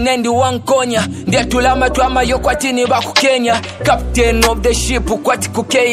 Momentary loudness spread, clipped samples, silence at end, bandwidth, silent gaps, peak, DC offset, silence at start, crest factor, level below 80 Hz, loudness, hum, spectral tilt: 4 LU; under 0.1%; 0 s; 15 kHz; none; 0 dBFS; under 0.1%; 0 s; 14 dB; -26 dBFS; -14 LUFS; none; -4 dB/octave